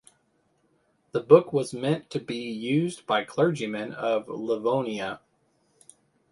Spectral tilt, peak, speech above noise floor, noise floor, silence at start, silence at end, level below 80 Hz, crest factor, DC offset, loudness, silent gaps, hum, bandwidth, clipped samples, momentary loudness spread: -6 dB/octave; -4 dBFS; 44 dB; -69 dBFS; 1.15 s; 1.15 s; -70 dBFS; 24 dB; under 0.1%; -26 LUFS; none; none; 11.5 kHz; under 0.1%; 14 LU